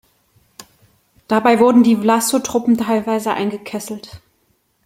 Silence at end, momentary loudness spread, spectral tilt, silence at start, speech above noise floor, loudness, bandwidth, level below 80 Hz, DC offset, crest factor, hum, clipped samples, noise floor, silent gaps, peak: 0.7 s; 15 LU; -4.5 dB/octave; 0.6 s; 47 dB; -16 LUFS; 16.5 kHz; -58 dBFS; under 0.1%; 16 dB; none; under 0.1%; -63 dBFS; none; -2 dBFS